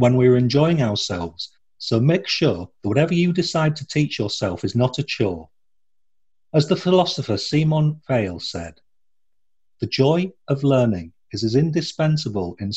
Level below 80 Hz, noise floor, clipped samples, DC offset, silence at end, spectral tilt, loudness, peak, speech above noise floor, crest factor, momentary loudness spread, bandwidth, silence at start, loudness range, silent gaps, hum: -52 dBFS; -82 dBFS; under 0.1%; 0.1%; 0 s; -6.5 dB/octave; -20 LUFS; -4 dBFS; 63 dB; 18 dB; 11 LU; 8.2 kHz; 0 s; 3 LU; none; none